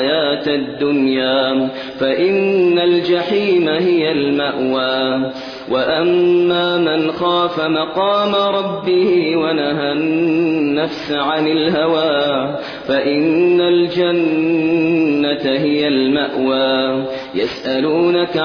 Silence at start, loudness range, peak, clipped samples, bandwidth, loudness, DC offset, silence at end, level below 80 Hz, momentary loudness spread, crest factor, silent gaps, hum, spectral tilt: 0 s; 1 LU; -4 dBFS; under 0.1%; 5.4 kHz; -16 LUFS; under 0.1%; 0 s; -54 dBFS; 6 LU; 12 dB; none; none; -7 dB/octave